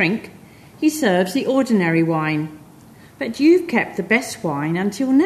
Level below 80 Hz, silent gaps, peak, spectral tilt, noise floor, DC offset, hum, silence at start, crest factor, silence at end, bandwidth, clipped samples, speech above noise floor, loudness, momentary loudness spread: -60 dBFS; none; -2 dBFS; -5.5 dB/octave; -45 dBFS; under 0.1%; none; 0 s; 18 dB; 0 s; 13.5 kHz; under 0.1%; 27 dB; -19 LUFS; 10 LU